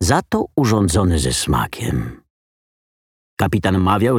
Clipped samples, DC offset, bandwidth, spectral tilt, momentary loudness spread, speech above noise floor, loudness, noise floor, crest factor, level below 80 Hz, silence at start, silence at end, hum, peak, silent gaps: under 0.1%; under 0.1%; 17 kHz; -5.5 dB/octave; 8 LU; over 73 dB; -18 LUFS; under -90 dBFS; 18 dB; -34 dBFS; 0 s; 0 s; none; -2 dBFS; 2.30-3.37 s